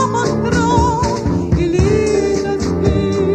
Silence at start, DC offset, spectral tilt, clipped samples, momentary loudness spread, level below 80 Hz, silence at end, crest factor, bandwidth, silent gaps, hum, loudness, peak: 0 s; under 0.1%; -6.5 dB/octave; under 0.1%; 3 LU; -26 dBFS; 0 s; 14 dB; 9.6 kHz; none; none; -15 LUFS; 0 dBFS